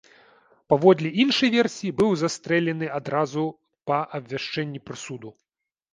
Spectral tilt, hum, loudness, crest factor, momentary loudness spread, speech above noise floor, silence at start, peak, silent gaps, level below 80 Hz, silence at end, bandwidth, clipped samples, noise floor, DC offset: -5.5 dB/octave; none; -23 LUFS; 22 dB; 16 LU; 35 dB; 0.7 s; -2 dBFS; none; -62 dBFS; 0.6 s; 10 kHz; under 0.1%; -58 dBFS; under 0.1%